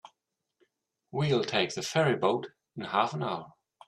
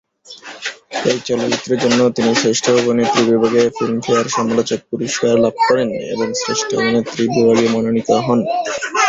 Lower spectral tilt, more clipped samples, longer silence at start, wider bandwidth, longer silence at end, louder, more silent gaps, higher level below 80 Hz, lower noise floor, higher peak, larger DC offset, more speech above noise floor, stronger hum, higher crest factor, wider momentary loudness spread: about the same, -5 dB/octave vs -4 dB/octave; neither; second, 0.05 s vs 0.3 s; first, 13 kHz vs 8 kHz; first, 0.35 s vs 0 s; second, -29 LUFS vs -16 LUFS; neither; second, -70 dBFS vs -54 dBFS; first, -83 dBFS vs -37 dBFS; second, -10 dBFS vs -2 dBFS; neither; first, 54 dB vs 22 dB; neither; first, 22 dB vs 14 dB; first, 12 LU vs 7 LU